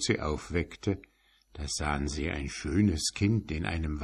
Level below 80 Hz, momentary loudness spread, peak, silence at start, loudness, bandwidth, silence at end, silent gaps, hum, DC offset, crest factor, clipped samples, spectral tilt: -40 dBFS; 7 LU; -12 dBFS; 0 s; -31 LUFS; 13 kHz; 0 s; none; none; under 0.1%; 20 dB; under 0.1%; -5 dB/octave